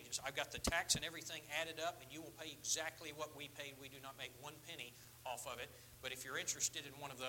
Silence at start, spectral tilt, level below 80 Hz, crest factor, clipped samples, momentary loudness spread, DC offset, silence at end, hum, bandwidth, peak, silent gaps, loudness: 0 s; -1.5 dB/octave; -64 dBFS; 26 dB; under 0.1%; 14 LU; under 0.1%; 0 s; none; 17 kHz; -22 dBFS; none; -44 LUFS